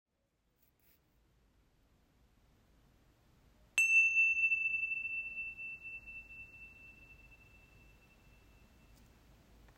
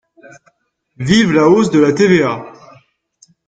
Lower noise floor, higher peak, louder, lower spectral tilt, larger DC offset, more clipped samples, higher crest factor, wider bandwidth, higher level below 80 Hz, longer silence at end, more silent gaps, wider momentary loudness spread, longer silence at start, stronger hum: first, -80 dBFS vs -58 dBFS; second, -16 dBFS vs 0 dBFS; second, -30 LUFS vs -12 LUFS; second, 0 dB/octave vs -6 dB/octave; neither; neither; first, 24 dB vs 14 dB; first, 16 kHz vs 9.2 kHz; second, -68 dBFS vs -50 dBFS; first, 2.45 s vs 1 s; neither; first, 25 LU vs 11 LU; first, 3.75 s vs 1 s; neither